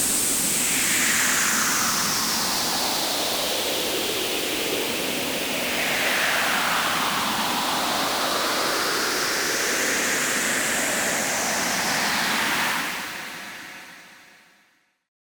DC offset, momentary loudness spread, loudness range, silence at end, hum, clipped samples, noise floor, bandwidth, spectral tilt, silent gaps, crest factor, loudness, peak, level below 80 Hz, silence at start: under 0.1%; 5 LU; 3 LU; 1 s; none; under 0.1%; -63 dBFS; over 20 kHz; -0.5 dB/octave; none; 16 dB; -21 LUFS; -10 dBFS; -56 dBFS; 0 s